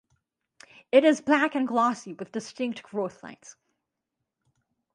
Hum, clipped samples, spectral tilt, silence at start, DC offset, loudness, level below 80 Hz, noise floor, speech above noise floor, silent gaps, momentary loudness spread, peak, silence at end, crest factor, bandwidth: none; under 0.1%; -4.5 dB/octave; 0.95 s; under 0.1%; -25 LUFS; -76 dBFS; -84 dBFS; 59 dB; none; 15 LU; -6 dBFS; 1.45 s; 22 dB; 11 kHz